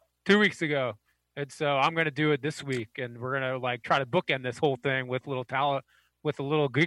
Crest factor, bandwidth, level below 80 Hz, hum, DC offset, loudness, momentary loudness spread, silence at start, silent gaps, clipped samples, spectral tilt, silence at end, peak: 20 dB; 12 kHz; -72 dBFS; none; under 0.1%; -28 LUFS; 10 LU; 0.25 s; none; under 0.1%; -5.5 dB/octave; 0 s; -8 dBFS